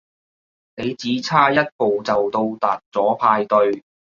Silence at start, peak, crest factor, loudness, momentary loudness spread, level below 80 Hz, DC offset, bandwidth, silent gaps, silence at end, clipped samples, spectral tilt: 0.75 s; -2 dBFS; 18 dB; -19 LUFS; 9 LU; -60 dBFS; under 0.1%; 7.4 kHz; 1.72-1.79 s, 2.86-2.92 s; 0.35 s; under 0.1%; -5.5 dB/octave